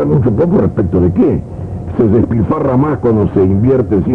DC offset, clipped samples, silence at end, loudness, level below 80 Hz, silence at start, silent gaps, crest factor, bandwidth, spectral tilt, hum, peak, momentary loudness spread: under 0.1%; under 0.1%; 0 s; -12 LUFS; -32 dBFS; 0 s; none; 10 dB; 4.2 kHz; -11.5 dB/octave; none; 0 dBFS; 5 LU